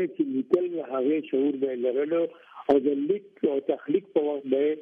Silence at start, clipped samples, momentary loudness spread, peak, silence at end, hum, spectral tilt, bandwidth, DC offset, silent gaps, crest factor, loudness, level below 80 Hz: 0 s; under 0.1%; 5 LU; -10 dBFS; 0 s; none; -8.5 dB/octave; 4.4 kHz; under 0.1%; none; 16 dB; -27 LUFS; -74 dBFS